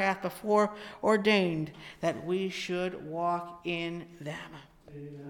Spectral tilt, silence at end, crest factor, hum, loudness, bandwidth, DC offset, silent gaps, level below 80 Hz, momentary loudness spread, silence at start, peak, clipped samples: -5.5 dB/octave; 0 s; 20 dB; none; -31 LUFS; 18.5 kHz; under 0.1%; none; -66 dBFS; 17 LU; 0 s; -12 dBFS; under 0.1%